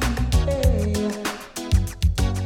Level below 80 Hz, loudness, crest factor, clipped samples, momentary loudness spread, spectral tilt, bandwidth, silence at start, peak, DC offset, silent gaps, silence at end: -24 dBFS; -23 LUFS; 14 dB; under 0.1%; 8 LU; -5.5 dB/octave; 17 kHz; 0 s; -6 dBFS; under 0.1%; none; 0 s